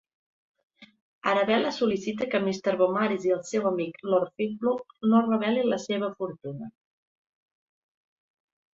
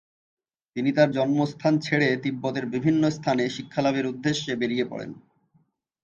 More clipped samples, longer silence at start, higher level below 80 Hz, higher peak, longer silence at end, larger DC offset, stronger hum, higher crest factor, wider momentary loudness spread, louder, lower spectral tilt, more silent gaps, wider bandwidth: neither; about the same, 0.8 s vs 0.75 s; about the same, -70 dBFS vs -66 dBFS; about the same, -8 dBFS vs -6 dBFS; first, 2.05 s vs 0.85 s; neither; neither; about the same, 20 dB vs 18 dB; first, 10 LU vs 7 LU; about the same, -26 LUFS vs -25 LUFS; about the same, -5.5 dB/octave vs -6 dB/octave; first, 1.01-1.21 s vs none; about the same, 7.8 kHz vs 7.6 kHz